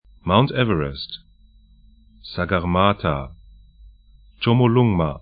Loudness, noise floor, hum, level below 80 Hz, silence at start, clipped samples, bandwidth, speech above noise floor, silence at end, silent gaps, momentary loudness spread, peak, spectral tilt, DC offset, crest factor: -20 LUFS; -52 dBFS; none; -42 dBFS; 0.25 s; under 0.1%; 5 kHz; 32 dB; 0 s; none; 17 LU; 0 dBFS; -12 dB/octave; under 0.1%; 22 dB